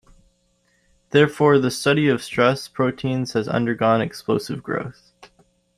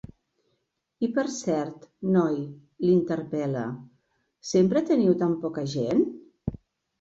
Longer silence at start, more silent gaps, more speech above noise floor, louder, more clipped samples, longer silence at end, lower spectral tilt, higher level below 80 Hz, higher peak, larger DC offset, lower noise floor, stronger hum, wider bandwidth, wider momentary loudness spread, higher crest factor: first, 1.15 s vs 1 s; neither; second, 45 dB vs 52 dB; first, -20 LUFS vs -26 LUFS; neither; first, 0.85 s vs 0.45 s; about the same, -6 dB/octave vs -7 dB/octave; about the same, -58 dBFS vs -58 dBFS; first, -2 dBFS vs -8 dBFS; neither; second, -65 dBFS vs -76 dBFS; neither; first, 13.5 kHz vs 8 kHz; second, 10 LU vs 14 LU; about the same, 20 dB vs 18 dB